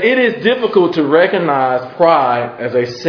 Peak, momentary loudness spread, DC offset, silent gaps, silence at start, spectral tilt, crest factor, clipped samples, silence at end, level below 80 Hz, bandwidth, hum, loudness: 0 dBFS; 6 LU; under 0.1%; none; 0 s; -6.5 dB/octave; 14 dB; under 0.1%; 0 s; -58 dBFS; 5.4 kHz; none; -13 LUFS